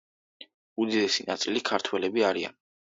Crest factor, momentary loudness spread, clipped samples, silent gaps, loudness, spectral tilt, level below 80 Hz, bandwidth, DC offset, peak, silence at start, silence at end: 20 dB; 7 LU; under 0.1%; 0.54-0.76 s; -27 LUFS; -3 dB/octave; -72 dBFS; 7.8 kHz; under 0.1%; -8 dBFS; 0.4 s; 0.4 s